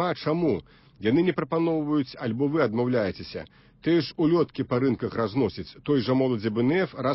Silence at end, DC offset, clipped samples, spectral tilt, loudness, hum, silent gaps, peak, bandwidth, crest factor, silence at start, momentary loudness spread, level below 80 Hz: 0 s; under 0.1%; under 0.1%; -11 dB/octave; -25 LUFS; none; none; -10 dBFS; 5.8 kHz; 16 dB; 0 s; 7 LU; -56 dBFS